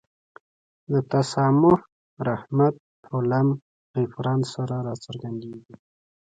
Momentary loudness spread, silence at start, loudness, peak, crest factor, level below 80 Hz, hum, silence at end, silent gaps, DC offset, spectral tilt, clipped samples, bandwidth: 15 LU; 0.9 s; -24 LUFS; -6 dBFS; 18 dB; -60 dBFS; none; 0.6 s; 1.92-2.17 s, 2.80-3.03 s, 3.62-3.94 s; under 0.1%; -7.5 dB/octave; under 0.1%; 9.2 kHz